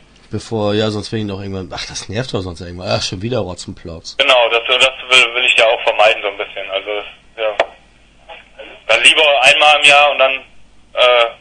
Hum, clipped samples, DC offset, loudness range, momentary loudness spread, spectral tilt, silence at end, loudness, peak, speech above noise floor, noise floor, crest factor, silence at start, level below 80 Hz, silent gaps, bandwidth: none; 0.1%; under 0.1%; 10 LU; 18 LU; -2.5 dB/octave; 0.05 s; -12 LUFS; 0 dBFS; 33 dB; -47 dBFS; 14 dB; 0.3 s; -48 dBFS; none; 12 kHz